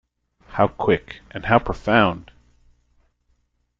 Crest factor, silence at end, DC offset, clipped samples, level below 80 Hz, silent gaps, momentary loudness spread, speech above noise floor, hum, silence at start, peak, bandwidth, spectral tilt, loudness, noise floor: 22 dB; 1.55 s; under 0.1%; under 0.1%; -44 dBFS; none; 15 LU; 47 dB; 60 Hz at -45 dBFS; 0.5 s; -2 dBFS; 7.6 kHz; -7.5 dB/octave; -20 LUFS; -67 dBFS